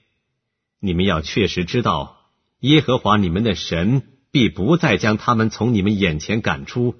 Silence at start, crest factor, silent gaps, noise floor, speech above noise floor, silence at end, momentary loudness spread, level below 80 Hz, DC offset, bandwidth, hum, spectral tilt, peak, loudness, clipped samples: 0.85 s; 16 dB; none; -76 dBFS; 58 dB; 0.05 s; 7 LU; -40 dBFS; under 0.1%; 6.6 kHz; none; -6 dB/octave; -2 dBFS; -19 LUFS; under 0.1%